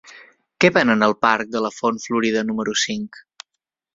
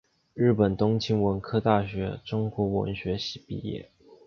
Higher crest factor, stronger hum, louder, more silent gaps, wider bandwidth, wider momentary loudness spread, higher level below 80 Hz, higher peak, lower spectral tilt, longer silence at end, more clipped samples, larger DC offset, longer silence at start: about the same, 20 dB vs 20 dB; neither; first, -19 LUFS vs -27 LUFS; neither; first, 7.8 kHz vs 6.8 kHz; second, 8 LU vs 12 LU; second, -60 dBFS vs -50 dBFS; first, -2 dBFS vs -8 dBFS; second, -4 dB/octave vs -7.5 dB/octave; first, 0.75 s vs 0.1 s; neither; neither; second, 0.05 s vs 0.35 s